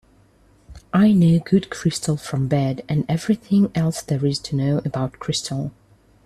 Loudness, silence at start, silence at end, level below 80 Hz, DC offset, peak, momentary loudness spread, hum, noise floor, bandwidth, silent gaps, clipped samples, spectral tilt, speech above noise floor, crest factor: -21 LUFS; 0.7 s; 0.55 s; -50 dBFS; under 0.1%; -4 dBFS; 9 LU; none; -55 dBFS; 13.5 kHz; none; under 0.1%; -6.5 dB/octave; 35 dB; 16 dB